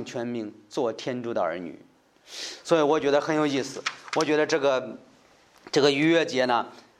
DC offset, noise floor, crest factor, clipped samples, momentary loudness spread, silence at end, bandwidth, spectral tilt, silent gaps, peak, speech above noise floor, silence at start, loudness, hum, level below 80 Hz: under 0.1%; -57 dBFS; 20 dB; under 0.1%; 14 LU; 0.2 s; 12.5 kHz; -4.5 dB/octave; none; -6 dBFS; 32 dB; 0 s; -25 LUFS; none; -74 dBFS